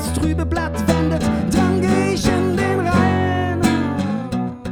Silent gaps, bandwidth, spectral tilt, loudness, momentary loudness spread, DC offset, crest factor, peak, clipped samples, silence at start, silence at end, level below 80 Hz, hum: none; 18 kHz; -6 dB/octave; -18 LUFS; 6 LU; 0.2%; 16 dB; -2 dBFS; under 0.1%; 0 s; 0 s; -32 dBFS; none